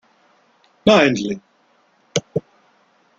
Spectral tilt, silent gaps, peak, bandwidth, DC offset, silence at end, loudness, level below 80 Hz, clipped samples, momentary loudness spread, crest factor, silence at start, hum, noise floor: -4.5 dB/octave; none; -2 dBFS; 7.8 kHz; under 0.1%; 0.8 s; -18 LUFS; -56 dBFS; under 0.1%; 15 LU; 20 dB; 0.85 s; none; -59 dBFS